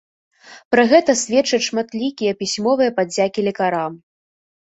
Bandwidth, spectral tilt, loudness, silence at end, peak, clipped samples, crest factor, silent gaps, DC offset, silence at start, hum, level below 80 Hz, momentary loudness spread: 8.2 kHz; -3.5 dB/octave; -18 LUFS; 0.7 s; -2 dBFS; under 0.1%; 18 dB; 0.65-0.71 s; under 0.1%; 0.5 s; none; -62 dBFS; 9 LU